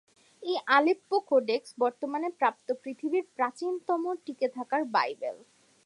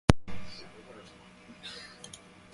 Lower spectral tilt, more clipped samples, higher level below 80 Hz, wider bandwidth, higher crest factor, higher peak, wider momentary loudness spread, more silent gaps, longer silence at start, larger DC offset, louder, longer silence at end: second, -4 dB/octave vs -5.5 dB/octave; neither; second, -88 dBFS vs -42 dBFS; about the same, 11.5 kHz vs 11.5 kHz; second, 20 dB vs 32 dB; second, -10 dBFS vs 0 dBFS; second, 11 LU vs 19 LU; neither; first, 0.4 s vs 0.1 s; neither; first, -29 LUFS vs -38 LUFS; first, 0.5 s vs 0.35 s